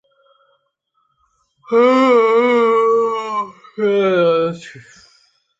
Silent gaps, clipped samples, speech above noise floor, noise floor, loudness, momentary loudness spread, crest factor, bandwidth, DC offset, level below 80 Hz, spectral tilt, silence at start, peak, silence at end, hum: none; under 0.1%; 54 dB; -67 dBFS; -15 LUFS; 12 LU; 14 dB; 7.8 kHz; under 0.1%; -66 dBFS; -6 dB/octave; 1.7 s; -2 dBFS; 0.8 s; none